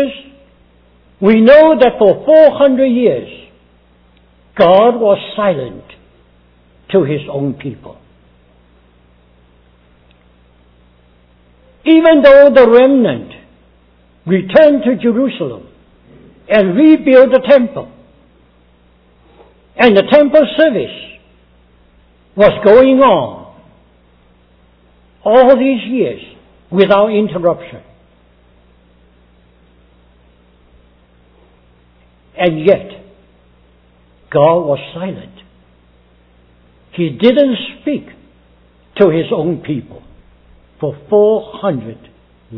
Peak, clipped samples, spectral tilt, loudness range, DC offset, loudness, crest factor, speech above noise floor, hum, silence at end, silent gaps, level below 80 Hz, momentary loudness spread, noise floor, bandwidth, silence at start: 0 dBFS; 0.5%; -9 dB/octave; 10 LU; under 0.1%; -10 LUFS; 14 dB; 39 dB; 60 Hz at -45 dBFS; 0 s; none; -46 dBFS; 18 LU; -49 dBFS; 5.4 kHz; 0 s